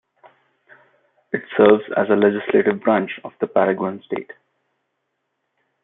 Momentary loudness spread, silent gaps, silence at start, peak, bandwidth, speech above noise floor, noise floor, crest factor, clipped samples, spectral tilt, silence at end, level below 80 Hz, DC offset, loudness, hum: 15 LU; none; 1.35 s; -2 dBFS; 3.9 kHz; 56 dB; -75 dBFS; 18 dB; under 0.1%; -10.5 dB/octave; 1.5 s; -66 dBFS; under 0.1%; -19 LUFS; none